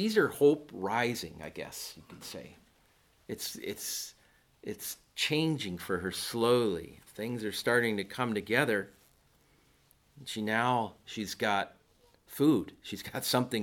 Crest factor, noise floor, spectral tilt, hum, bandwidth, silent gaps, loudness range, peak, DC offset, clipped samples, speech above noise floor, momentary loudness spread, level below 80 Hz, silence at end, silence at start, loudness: 22 dB; -67 dBFS; -4 dB/octave; none; 18.5 kHz; none; 9 LU; -10 dBFS; under 0.1%; under 0.1%; 35 dB; 17 LU; -66 dBFS; 0 s; 0 s; -32 LUFS